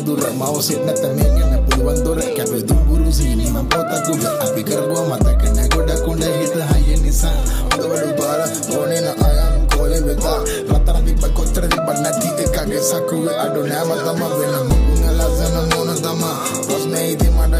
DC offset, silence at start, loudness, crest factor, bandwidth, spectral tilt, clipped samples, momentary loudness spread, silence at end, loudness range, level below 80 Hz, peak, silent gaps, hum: under 0.1%; 0 s; -17 LUFS; 12 dB; 15.5 kHz; -5 dB/octave; under 0.1%; 3 LU; 0 s; 1 LU; -18 dBFS; -2 dBFS; none; none